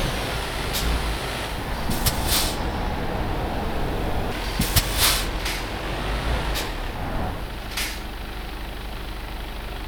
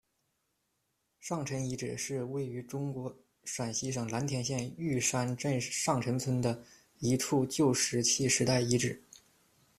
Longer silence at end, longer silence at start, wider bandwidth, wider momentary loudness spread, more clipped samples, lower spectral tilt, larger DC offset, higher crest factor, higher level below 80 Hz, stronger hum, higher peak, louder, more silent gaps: second, 0 s vs 0.8 s; second, 0 s vs 1.2 s; first, over 20 kHz vs 15 kHz; about the same, 13 LU vs 11 LU; neither; about the same, -3.5 dB/octave vs -4 dB/octave; neither; about the same, 22 dB vs 22 dB; first, -30 dBFS vs -64 dBFS; neither; first, -4 dBFS vs -12 dBFS; first, -26 LUFS vs -32 LUFS; neither